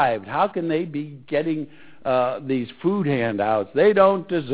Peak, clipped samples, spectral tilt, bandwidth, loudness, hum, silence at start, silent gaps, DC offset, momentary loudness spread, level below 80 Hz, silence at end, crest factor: -2 dBFS; under 0.1%; -10.5 dB/octave; 4 kHz; -22 LUFS; none; 0 s; none; 0.3%; 12 LU; -60 dBFS; 0 s; 18 dB